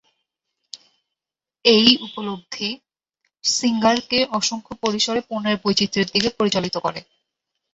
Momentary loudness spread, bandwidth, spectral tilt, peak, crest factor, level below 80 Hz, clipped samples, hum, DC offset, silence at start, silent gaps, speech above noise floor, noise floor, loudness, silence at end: 16 LU; 8.2 kHz; -3 dB/octave; 0 dBFS; 22 dB; -58 dBFS; under 0.1%; none; under 0.1%; 0.75 s; none; 68 dB; -88 dBFS; -20 LUFS; 0.7 s